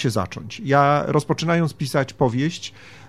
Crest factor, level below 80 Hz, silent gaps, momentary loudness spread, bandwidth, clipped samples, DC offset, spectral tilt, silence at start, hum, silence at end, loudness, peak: 18 dB; -52 dBFS; none; 13 LU; 14 kHz; under 0.1%; 0.3%; -6 dB/octave; 0 s; none; 0 s; -21 LUFS; -4 dBFS